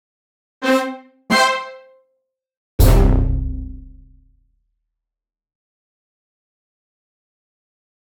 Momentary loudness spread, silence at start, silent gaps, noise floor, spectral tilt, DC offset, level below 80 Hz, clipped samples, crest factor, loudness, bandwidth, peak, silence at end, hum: 19 LU; 0.6 s; 2.57-2.78 s; -87 dBFS; -5 dB/octave; under 0.1%; -24 dBFS; under 0.1%; 20 dB; -18 LUFS; 20 kHz; -2 dBFS; 4.2 s; none